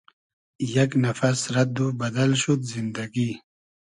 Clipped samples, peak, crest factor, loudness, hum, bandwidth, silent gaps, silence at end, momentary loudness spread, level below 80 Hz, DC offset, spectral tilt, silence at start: under 0.1%; -8 dBFS; 16 dB; -24 LUFS; none; 11 kHz; none; 0.55 s; 8 LU; -62 dBFS; under 0.1%; -5.5 dB/octave; 0.6 s